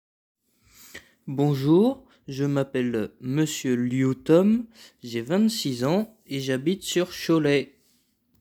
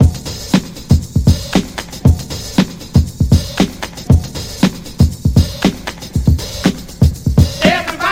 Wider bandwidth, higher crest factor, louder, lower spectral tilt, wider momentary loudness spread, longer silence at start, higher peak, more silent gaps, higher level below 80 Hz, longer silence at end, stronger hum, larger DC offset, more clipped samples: first, over 20 kHz vs 16.5 kHz; about the same, 18 dB vs 14 dB; second, -24 LUFS vs -15 LUFS; about the same, -6 dB/octave vs -6 dB/octave; first, 18 LU vs 5 LU; first, 0.95 s vs 0 s; second, -6 dBFS vs 0 dBFS; neither; second, -64 dBFS vs -22 dBFS; first, 0.75 s vs 0 s; neither; neither; neither